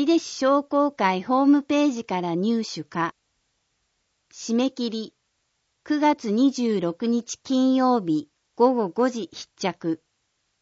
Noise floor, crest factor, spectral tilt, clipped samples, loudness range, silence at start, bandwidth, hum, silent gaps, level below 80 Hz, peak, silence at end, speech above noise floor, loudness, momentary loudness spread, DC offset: -74 dBFS; 18 dB; -5 dB/octave; under 0.1%; 6 LU; 0 s; 8 kHz; none; none; -72 dBFS; -6 dBFS; 0.65 s; 51 dB; -23 LUFS; 10 LU; under 0.1%